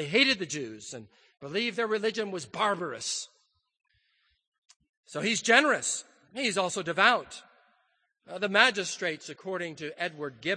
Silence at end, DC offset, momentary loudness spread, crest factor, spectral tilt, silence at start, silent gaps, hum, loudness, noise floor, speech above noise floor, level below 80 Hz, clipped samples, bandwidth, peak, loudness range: 0 s; under 0.1%; 20 LU; 26 dB; -2 dB/octave; 0 s; 4.47-4.52 s, 4.58-4.62 s, 4.76-4.80 s, 4.89-5.04 s; none; -28 LUFS; -73 dBFS; 44 dB; -76 dBFS; under 0.1%; 9.8 kHz; -4 dBFS; 6 LU